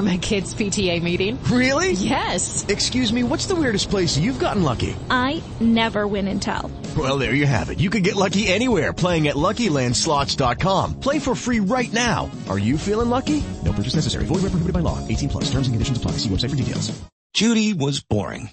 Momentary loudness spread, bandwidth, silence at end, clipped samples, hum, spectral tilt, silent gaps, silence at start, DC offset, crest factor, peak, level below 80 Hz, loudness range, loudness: 6 LU; 8.8 kHz; 0 s; under 0.1%; none; -4.5 dB/octave; 17.12-17.30 s; 0 s; under 0.1%; 16 dB; -4 dBFS; -36 dBFS; 3 LU; -21 LUFS